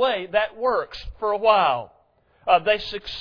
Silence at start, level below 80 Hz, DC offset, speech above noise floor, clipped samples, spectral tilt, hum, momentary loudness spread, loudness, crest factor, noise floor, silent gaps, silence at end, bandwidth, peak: 0 s; -48 dBFS; under 0.1%; 38 dB; under 0.1%; -5 dB/octave; none; 11 LU; -22 LUFS; 18 dB; -60 dBFS; none; 0 s; 5.4 kHz; -4 dBFS